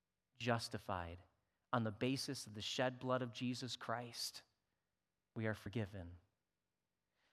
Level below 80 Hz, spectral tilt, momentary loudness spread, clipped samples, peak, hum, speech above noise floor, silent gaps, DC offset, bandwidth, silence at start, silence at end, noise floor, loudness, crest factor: -78 dBFS; -4.5 dB/octave; 12 LU; under 0.1%; -22 dBFS; none; over 47 dB; none; under 0.1%; 15.5 kHz; 0.4 s; 1.15 s; under -90 dBFS; -43 LUFS; 24 dB